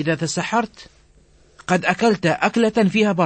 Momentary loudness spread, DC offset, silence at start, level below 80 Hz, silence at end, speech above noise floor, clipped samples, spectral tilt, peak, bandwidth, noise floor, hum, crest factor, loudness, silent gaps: 6 LU; under 0.1%; 0 s; -54 dBFS; 0 s; 34 dB; under 0.1%; -5 dB/octave; -2 dBFS; 8.8 kHz; -53 dBFS; none; 18 dB; -19 LUFS; none